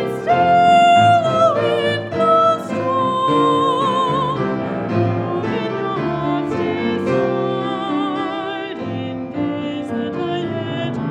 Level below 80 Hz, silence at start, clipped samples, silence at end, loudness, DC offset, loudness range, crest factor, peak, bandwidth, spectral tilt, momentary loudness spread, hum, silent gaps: -54 dBFS; 0 s; under 0.1%; 0 s; -18 LUFS; under 0.1%; 8 LU; 14 dB; -4 dBFS; 11 kHz; -6.5 dB/octave; 11 LU; none; none